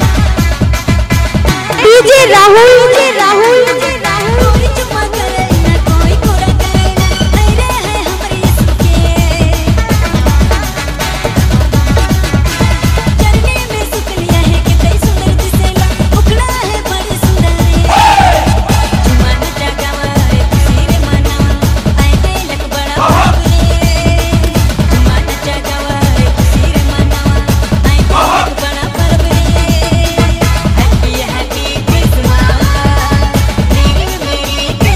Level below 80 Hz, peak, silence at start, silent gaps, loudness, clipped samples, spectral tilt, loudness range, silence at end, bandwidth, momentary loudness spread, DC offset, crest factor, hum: -14 dBFS; 0 dBFS; 0 s; none; -10 LUFS; 0.1%; -5 dB/octave; 5 LU; 0 s; 16 kHz; 7 LU; under 0.1%; 8 dB; none